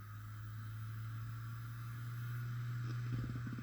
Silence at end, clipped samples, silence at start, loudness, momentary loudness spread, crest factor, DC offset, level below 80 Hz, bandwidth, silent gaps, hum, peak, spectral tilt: 0 s; under 0.1%; 0 s; -45 LUFS; 6 LU; 14 dB; under 0.1%; -62 dBFS; over 20 kHz; none; none; -30 dBFS; -7 dB/octave